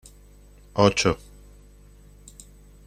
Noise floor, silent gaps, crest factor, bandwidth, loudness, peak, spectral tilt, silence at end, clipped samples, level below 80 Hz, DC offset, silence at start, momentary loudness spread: -50 dBFS; none; 24 dB; 15 kHz; -22 LUFS; -4 dBFS; -4.5 dB/octave; 1.7 s; under 0.1%; -48 dBFS; under 0.1%; 0.75 s; 27 LU